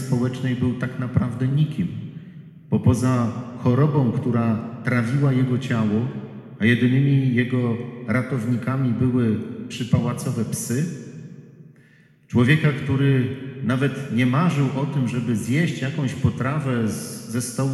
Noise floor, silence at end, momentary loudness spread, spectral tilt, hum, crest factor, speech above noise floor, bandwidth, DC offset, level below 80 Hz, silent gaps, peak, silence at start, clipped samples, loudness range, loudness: -54 dBFS; 0 s; 10 LU; -7 dB/octave; none; 16 dB; 33 dB; 13 kHz; under 0.1%; -52 dBFS; none; -4 dBFS; 0 s; under 0.1%; 3 LU; -22 LUFS